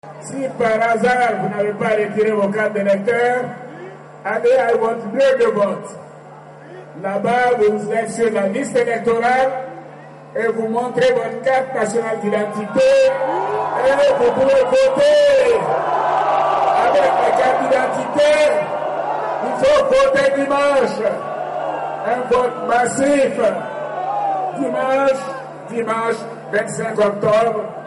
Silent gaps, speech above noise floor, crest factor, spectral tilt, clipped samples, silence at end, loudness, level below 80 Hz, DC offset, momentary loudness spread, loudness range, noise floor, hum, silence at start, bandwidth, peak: none; 22 dB; 10 dB; -4.5 dB/octave; under 0.1%; 0 s; -17 LUFS; -54 dBFS; under 0.1%; 11 LU; 5 LU; -38 dBFS; none; 0.05 s; 11.5 kHz; -6 dBFS